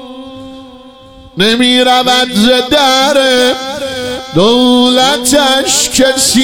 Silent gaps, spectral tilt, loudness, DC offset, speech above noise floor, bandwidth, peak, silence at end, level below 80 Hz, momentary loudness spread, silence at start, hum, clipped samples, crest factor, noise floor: none; -2.5 dB/octave; -8 LUFS; 1%; 27 dB; 18 kHz; 0 dBFS; 0 s; -40 dBFS; 11 LU; 0 s; none; under 0.1%; 10 dB; -35 dBFS